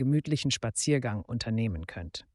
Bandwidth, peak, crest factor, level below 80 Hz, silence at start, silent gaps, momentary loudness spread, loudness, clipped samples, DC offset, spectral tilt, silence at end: 11.5 kHz; -14 dBFS; 16 dB; -50 dBFS; 0 s; none; 11 LU; -30 LUFS; under 0.1%; under 0.1%; -5 dB/octave; 0.15 s